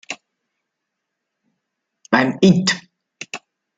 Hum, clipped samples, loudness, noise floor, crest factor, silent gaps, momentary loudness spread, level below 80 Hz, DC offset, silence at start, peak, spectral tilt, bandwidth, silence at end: none; under 0.1%; -17 LUFS; -79 dBFS; 20 dB; none; 19 LU; -62 dBFS; under 0.1%; 0.1 s; -2 dBFS; -5 dB/octave; 9.2 kHz; 0.4 s